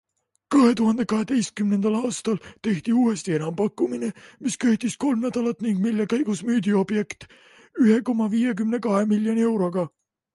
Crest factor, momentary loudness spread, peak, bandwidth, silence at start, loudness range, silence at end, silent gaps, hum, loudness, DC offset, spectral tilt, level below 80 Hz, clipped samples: 16 dB; 9 LU; -6 dBFS; 11.5 kHz; 0.5 s; 2 LU; 0.45 s; none; none; -23 LUFS; under 0.1%; -6 dB/octave; -64 dBFS; under 0.1%